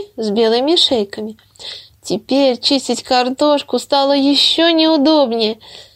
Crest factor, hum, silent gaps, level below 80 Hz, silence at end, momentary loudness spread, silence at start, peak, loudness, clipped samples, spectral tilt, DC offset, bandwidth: 14 dB; none; none; -58 dBFS; 0.15 s; 19 LU; 0 s; 0 dBFS; -14 LUFS; under 0.1%; -3.5 dB/octave; under 0.1%; 15.5 kHz